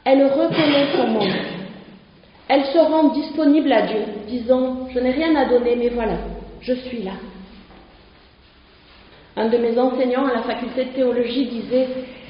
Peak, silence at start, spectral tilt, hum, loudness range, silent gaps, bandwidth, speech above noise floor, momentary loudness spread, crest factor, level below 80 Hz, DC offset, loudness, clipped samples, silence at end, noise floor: -2 dBFS; 0.05 s; -3.5 dB/octave; none; 9 LU; none; 5.4 kHz; 31 dB; 13 LU; 16 dB; -46 dBFS; under 0.1%; -19 LUFS; under 0.1%; 0 s; -50 dBFS